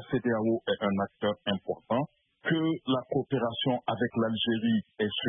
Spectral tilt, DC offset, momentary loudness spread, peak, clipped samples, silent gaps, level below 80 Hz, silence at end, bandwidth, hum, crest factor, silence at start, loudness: -10 dB/octave; under 0.1%; 4 LU; -16 dBFS; under 0.1%; none; -68 dBFS; 0 s; 3.8 kHz; none; 14 dB; 0 s; -30 LUFS